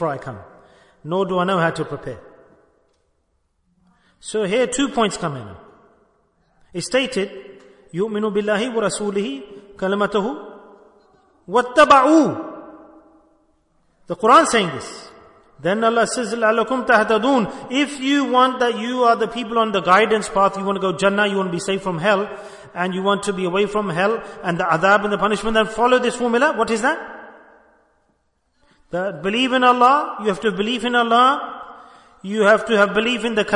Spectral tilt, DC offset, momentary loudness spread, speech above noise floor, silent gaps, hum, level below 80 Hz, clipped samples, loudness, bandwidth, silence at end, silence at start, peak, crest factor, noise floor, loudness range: -4.5 dB/octave; under 0.1%; 17 LU; 48 dB; none; none; -54 dBFS; under 0.1%; -18 LUFS; 11 kHz; 0 s; 0 s; -2 dBFS; 18 dB; -67 dBFS; 7 LU